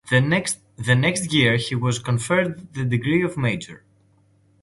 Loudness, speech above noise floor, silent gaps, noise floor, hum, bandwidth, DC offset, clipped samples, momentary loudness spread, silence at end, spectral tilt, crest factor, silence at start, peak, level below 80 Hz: -21 LUFS; 38 dB; none; -59 dBFS; none; 11.5 kHz; under 0.1%; under 0.1%; 9 LU; 0.85 s; -5 dB/octave; 18 dB; 0.05 s; -4 dBFS; -52 dBFS